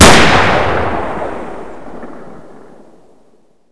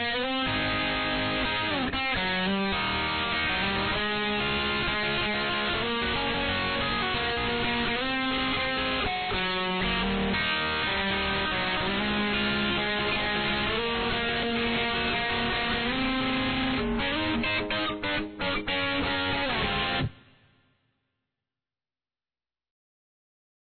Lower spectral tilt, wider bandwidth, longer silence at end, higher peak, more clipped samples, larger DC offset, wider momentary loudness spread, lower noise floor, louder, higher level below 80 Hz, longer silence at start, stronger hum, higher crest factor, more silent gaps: second, -3.5 dB/octave vs -7 dB/octave; first, 11 kHz vs 4.6 kHz; second, 0 s vs 3.45 s; first, 0 dBFS vs -16 dBFS; first, 2% vs under 0.1%; neither; first, 24 LU vs 1 LU; second, -52 dBFS vs under -90 dBFS; first, -11 LUFS vs -27 LUFS; first, -28 dBFS vs -44 dBFS; about the same, 0 s vs 0 s; neither; about the same, 14 dB vs 12 dB; neither